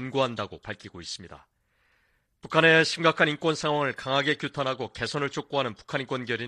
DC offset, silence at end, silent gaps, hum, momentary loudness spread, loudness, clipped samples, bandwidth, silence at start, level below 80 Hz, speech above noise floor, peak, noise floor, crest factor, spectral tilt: under 0.1%; 0 s; none; none; 18 LU; -25 LUFS; under 0.1%; 11 kHz; 0 s; -62 dBFS; 43 dB; -6 dBFS; -69 dBFS; 22 dB; -4.5 dB/octave